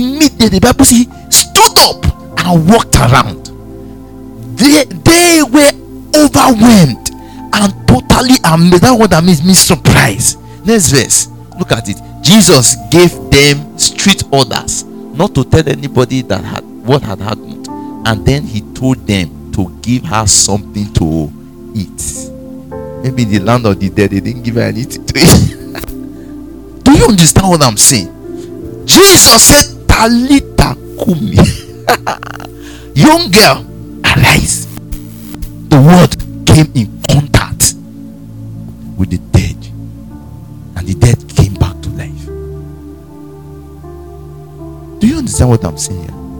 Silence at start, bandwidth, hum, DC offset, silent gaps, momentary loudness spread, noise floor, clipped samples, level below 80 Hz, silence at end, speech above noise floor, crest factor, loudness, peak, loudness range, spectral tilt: 0 s; over 20 kHz; none; 0.7%; none; 21 LU; -31 dBFS; 2%; -26 dBFS; 0 s; 23 dB; 10 dB; -8 LUFS; 0 dBFS; 10 LU; -4 dB/octave